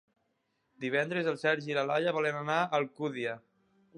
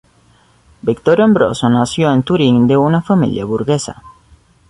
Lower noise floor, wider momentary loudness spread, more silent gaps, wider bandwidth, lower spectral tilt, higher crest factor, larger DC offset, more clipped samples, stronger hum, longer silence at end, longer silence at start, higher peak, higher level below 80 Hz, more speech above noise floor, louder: first, -78 dBFS vs -51 dBFS; about the same, 8 LU vs 8 LU; neither; about the same, 11 kHz vs 11.5 kHz; about the same, -5.5 dB/octave vs -6.5 dB/octave; about the same, 18 dB vs 14 dB; neither; neither; neither; about the same, 0.6 s vs 0.6 s; about the same, 0.8 s vs 0.85 s; second, -14 dBFS vs -2 dBFS; second, -84 dBFS vs -46 dBFS; first, 47 dB vs 38 dB; second, -31 LUFS vs -13 LUFS